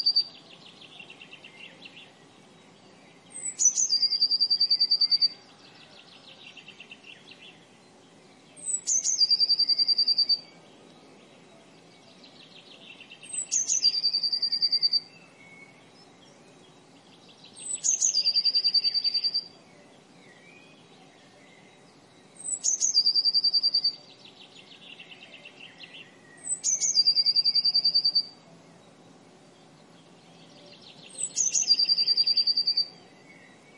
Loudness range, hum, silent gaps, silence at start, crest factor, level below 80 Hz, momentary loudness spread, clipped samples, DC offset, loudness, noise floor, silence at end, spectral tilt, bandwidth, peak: 9 LU; none; none; 0 s; 18 dB; -86 dBFS; 25 LU; under 0.1%; under 0.1%; -22 LUFS; -55 dBFS; 0.85 s; 2 dB/octave; 11.5 kHz; -10 dBFS